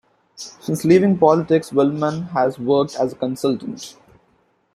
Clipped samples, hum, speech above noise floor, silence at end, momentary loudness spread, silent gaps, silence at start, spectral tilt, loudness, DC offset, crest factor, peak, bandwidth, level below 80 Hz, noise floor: under 0.1%; none; 44 dB; 0.85 s; 18 LU; none; 0.4 s; -6.5 dB/octave; -18 LUFS; under 0.1%; 18 dB; -2 dBFS; 15 kHz; -60 dBFS; -62 dBFS